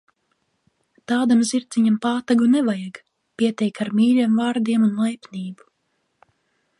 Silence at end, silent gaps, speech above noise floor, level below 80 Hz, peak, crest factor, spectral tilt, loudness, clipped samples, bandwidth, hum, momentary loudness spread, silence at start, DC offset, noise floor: 1.25 s; none; 52 dB; -70 dBFS; -6 dBFS; 16 dB; -5.5 dB/octave; -20 LUFS; under 0.1%; 11.5 kHz; none; 13 LU; 1.1 s; under 0.1%; -71 dBFS